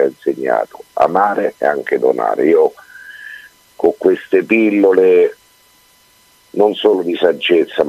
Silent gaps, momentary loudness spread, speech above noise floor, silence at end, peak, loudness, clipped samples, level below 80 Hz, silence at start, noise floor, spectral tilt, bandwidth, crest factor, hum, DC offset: none; 12 LU; 37 dB; 0 s; 0 dBFS; -14 LUFS; under 0.1%; -60 dBFS; 0 s; -51 dBFS; -6 dB/octave; 14 kHz; 14 dB; none; under 0.1%